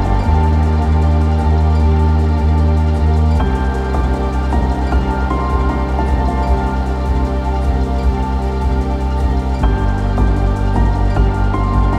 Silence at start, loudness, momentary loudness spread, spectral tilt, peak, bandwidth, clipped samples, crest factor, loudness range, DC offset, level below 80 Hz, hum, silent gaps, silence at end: 0 s; -16 LUFS; 4 LU; -8.5 dB/octave; -2 dBFS; 8.4 kHz; under 0.1%; 12 dB; 3 LU; under 0.1%; -16 dBFS; none; none; 0 s